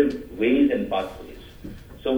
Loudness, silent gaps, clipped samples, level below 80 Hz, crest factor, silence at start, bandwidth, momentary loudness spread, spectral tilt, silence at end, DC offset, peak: -23 LUFS; none; under 0.1%; -46 dBFS; 18 dB; 0 s; over 20 kHz; 21 LU; -7 dB/octave; 0 s; under 0.1%; -6 dBFS